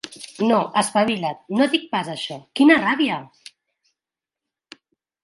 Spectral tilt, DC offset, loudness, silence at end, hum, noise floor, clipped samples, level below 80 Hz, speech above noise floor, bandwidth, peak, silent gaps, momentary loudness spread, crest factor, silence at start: -4 dB/octave; under 0.1%; -20 LUFS; 1.95 s; none; -88 dBFS; under 0.1%; -68 dBFS; 69 dB; 11.5 kHz; -2 dBFS; none; 14 LU; 22 dB; 0.05 s